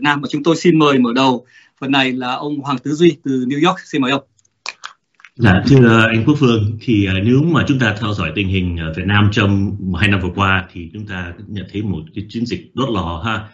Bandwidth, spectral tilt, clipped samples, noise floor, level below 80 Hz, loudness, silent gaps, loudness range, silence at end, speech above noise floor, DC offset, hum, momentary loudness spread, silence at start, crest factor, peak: 8.2 kHz; -6.5 dB/octave; under 0.1%; -46 dBFS; -42 dBFS; -15 LUFS; none; 6 LU; 0.05 s; 31 dB; under 0.1%; none; 15 LU; 0 s; 16 dB; 0 dBFS